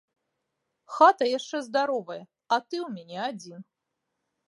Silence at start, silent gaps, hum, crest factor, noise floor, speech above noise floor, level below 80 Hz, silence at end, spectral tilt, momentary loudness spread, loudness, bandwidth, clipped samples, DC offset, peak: 0.9 s; none; none; 22 dB; -82 dBFS; 56 dB; -88 dBFS; 0.9 s; -4 dB/octave; 21 LU; -26 LUFS; 11.5 kHz; under 0.1%; under 0.1%; -6 dBFS